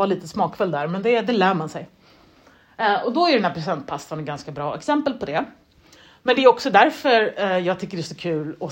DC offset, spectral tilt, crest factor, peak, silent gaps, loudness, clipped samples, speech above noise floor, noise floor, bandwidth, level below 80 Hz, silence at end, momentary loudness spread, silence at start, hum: under 0.1%; -5.5 dB/octave; 20 dB; 0 dBFS; none; -21 LUFS; under 0.1%; 32 dB; -53 dBFS; 16 kHz; -62 dBFS; 0 s; 14 LU; 0 s; none